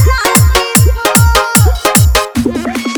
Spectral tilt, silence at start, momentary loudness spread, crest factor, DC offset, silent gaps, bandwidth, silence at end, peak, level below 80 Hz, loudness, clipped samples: -4 dB/octave; 0 s; 7 LU; 10 dB; under 0.1%; none; over 20 kHz; 0 s; 0 dBFS; -16 dBFS; -9 LUFS; 0.6%